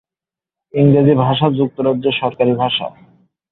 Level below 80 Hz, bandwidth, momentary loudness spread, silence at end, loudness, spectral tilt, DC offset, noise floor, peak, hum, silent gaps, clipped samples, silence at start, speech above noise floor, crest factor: -52 dBFS; 4.1 kHz; 8 LU; 0.65 s; -15 LUFS; -11 dB/octave; under 0.1%; -89 dBFS; -2 dBFS; none; none; under 0.1%; 0.75 s; 74 dB; 14 dB